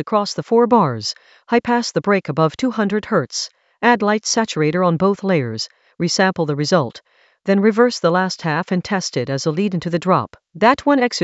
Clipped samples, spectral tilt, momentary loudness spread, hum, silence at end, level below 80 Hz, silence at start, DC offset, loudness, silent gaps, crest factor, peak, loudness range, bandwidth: under 0.1%; -5 dB/octave; 10 LU; none; 0 s; -58 dBFS; 0 s; under 0.1%; -18 LUFS; none; 18 dB; 0 dBFS; 1 LU; 8.2 kHz